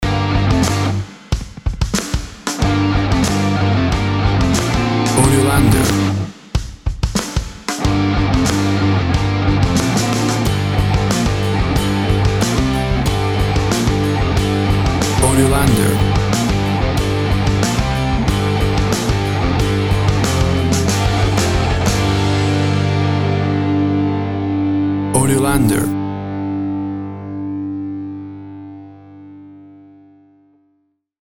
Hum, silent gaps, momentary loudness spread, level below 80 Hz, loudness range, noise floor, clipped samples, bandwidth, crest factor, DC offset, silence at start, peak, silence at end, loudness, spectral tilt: 50 Hz at -40 dBFS; none; 10 LU; -26 dBFS; 4 LU; -64 dBFS; under 0.1%; 16.5 kHz; 16 dB; under 0.1%; 0 s; 0 dBFS; 1.65 s; -16 LUFS; -5.5 dB/octave